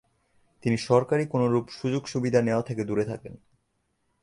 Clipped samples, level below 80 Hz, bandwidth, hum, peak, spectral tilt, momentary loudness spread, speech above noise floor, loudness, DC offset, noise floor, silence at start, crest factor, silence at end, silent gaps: under 0.1%; -60 dBFS; 11 kHz; none; -6 dBFS; -7 dB/octave; 10 LU; 49 dB; -26 LUFS; under 0.1%; -74 dBFS; 0.65 s; 20 dB; 0.85 s; none